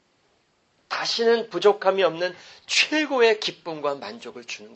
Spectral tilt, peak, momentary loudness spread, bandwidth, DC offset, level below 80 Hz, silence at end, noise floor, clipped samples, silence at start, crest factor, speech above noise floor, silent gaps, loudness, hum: -2.5 dB/octave; -4 dBFS; 16 LU; 8.6 kHz; under 0.1%; -78 dBFS; 0 s; -66 dBFS; under 0.1%; 0.9 s; 20 dB; 43 dB; none; -22 LUFS; none